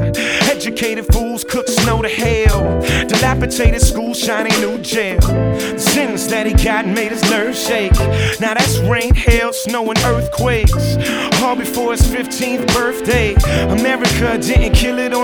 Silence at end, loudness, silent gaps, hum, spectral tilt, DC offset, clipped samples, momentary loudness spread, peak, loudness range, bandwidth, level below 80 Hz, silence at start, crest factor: 0 s; -15 LUFS; none; none; -4.5 dB/octave; under 0.1%; under 0.1%; 4 LU; 0 dBFS; 1 LU; over 20 kHz; -20 dBFS; 0 s; 14 dB